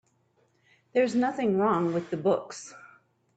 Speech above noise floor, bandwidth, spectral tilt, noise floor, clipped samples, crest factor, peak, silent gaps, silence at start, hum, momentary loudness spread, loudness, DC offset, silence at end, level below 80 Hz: 42 dB; 9 kHz; -6.5 dB/octave; -69 dBFS; under 0.1%; 16 dB; -12 dBFS; none; 0.95 s; none; 17 LU; -27 LUFS; under 0.1%; 0.5 s; -72 dBFS